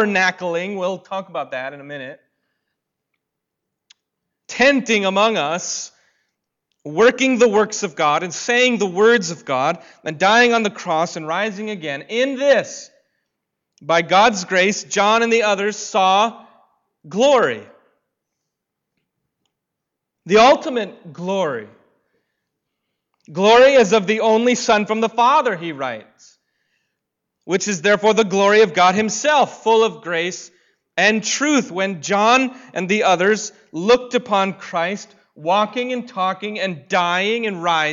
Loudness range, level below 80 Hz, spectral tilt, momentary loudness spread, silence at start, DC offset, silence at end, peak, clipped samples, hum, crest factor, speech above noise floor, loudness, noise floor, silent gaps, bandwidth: 6 LU; -62 dBFS; -3.5 dB/octave; 14 LU; 0 s; under 0.1%; 0 s; -4 dBFS; under 0.1%; none; 14 dB; 63 dB; -17 LUFS; -80 dBFS; none; 7.8 kHz